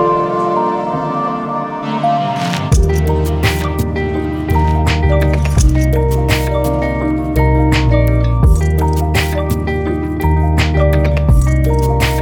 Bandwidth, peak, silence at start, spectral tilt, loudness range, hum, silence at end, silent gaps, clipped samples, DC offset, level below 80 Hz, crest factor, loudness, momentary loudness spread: 19.5 kHz; 0 dBFS; 0 s; -6.5 dB/octave; 2 LU; none; 0 s; none; under 0.1%; under 0.1%; -16 dBFS; 12 dB; -14 LUFS; 5 LU